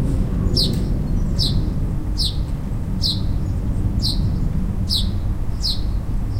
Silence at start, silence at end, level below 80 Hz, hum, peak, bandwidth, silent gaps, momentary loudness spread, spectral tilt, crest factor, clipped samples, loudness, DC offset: 0 s; 0 s; -22 dBFS; none; -4 dBFS; 16 kHz; none; 5 LU; -6 dB/octave; 14 dB; under 0.1%; -22 LUFS; under 0.1%